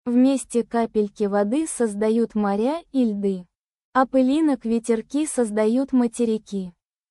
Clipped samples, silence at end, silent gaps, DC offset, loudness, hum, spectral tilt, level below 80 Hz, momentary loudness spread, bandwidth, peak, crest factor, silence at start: under 0.1%; 0.4 s; 3.58-3.65 s, 3.76-3.93 s; under 0.1%; -22 LUFS; none; -5.5 dB/octave; -60 dBFS; 7 LU; 12 kHz; -6 dBFS; 16 dB; 0.05 s